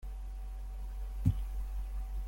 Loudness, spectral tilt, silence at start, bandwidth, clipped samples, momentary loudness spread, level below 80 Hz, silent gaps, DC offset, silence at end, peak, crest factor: -40 LUFS; -8 dB/octave; 0 s; 16.5 kHz; under 0.1%; 11 LU; -38 dBFS; none; under 0.1%; 0 s; -16 dBFS; 20 dB